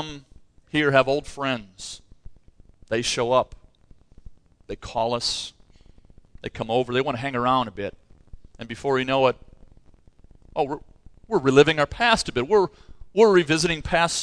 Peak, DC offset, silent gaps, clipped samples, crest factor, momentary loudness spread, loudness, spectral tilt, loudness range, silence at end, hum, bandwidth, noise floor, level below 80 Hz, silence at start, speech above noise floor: -2 dBFS; under 0.1%; none; under 0.1%; 22 dB; 20 LU; -22 LUFS; -4 dB/octave; 8 LU; 0 s; none; 11 kHz; -52 dBFS; -48 dBFS; 0 s; 30 dB